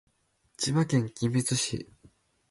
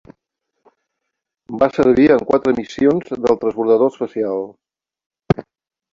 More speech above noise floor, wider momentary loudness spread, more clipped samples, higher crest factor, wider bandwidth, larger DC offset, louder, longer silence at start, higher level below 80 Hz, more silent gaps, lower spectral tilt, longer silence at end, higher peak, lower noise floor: second, 42 dB vs 63 dB; about the same, 10 LU vs 10 LU; neither; about the same, 16 dB vs 18 dB; first, 11.5 kHz vs 7.6 kHz; neither; second, -28 LUFS vs -17 LUFS; second, 0.6 s vs 1.5 s; second, -60 dBFS vs -48 dBFS; second, none vs 5.06-5.10 s; second, -4.5 dB/octave vs -8 dB/octave; first, 0.65 s vs 0.5 s; second, -14 dBFS vs 0 dBFS; second, -70 dBFS vs -78 dBFS